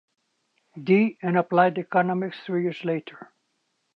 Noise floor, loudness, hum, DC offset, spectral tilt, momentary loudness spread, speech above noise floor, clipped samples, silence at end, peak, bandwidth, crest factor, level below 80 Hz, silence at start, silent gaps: -74 dBFS; -24 LUFS; none; under 0.1%; -9 dB/octave; 9 LU; 51 dB; under 0.1%; 0.7 s; -4 dBFS; 5.8 kHz; 20 dB; -78 dBFS; 0.75 s; none